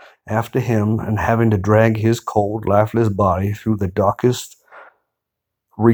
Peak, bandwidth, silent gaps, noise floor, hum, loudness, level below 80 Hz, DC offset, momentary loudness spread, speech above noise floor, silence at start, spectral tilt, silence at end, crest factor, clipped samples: 0 dBFS; over 20 kHz; none; -80 dBFS; none; -18 LUFS; -46 dBFS; under 0.1%; 6 LU; 63 dB; 0.25 s; -7.5 dB/octave; 0 s; 18 dB; under 0.1%